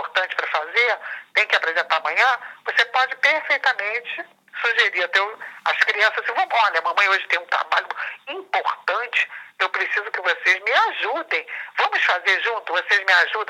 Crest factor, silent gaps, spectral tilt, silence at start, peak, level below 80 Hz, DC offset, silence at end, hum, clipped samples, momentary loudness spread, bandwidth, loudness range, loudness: 18 dB; none; 1 dB/octave; 0 s; -4 dBFS; under -90 dBFS; under 0.1%; 0.05 s; none; under 0.1%; 8 LU; 16 kHz; 2 LU; -20 LUFS